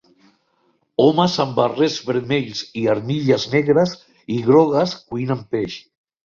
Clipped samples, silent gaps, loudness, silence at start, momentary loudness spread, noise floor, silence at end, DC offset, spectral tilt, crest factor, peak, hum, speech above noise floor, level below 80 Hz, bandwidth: under 0.1%; none; -19 LUFS; 1 s; 12 LU; -64 dBFS; 0.5 s; under 0.1%; -6 dB/octave; 18 dB; -2 dBFS; none; 46 dB; -56 dBFS; 7.4 kHz